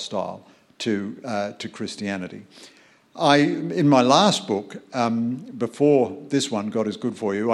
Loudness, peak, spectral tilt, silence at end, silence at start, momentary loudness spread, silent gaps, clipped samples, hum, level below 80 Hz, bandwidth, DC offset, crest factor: -22 LUFS; -2 dBFS; -5 dB/octave; 0 s; 0 s; 14 LU; none; under 0.1%; none; -68 dBFS; 12 kHz; under 0.1%; 22 dB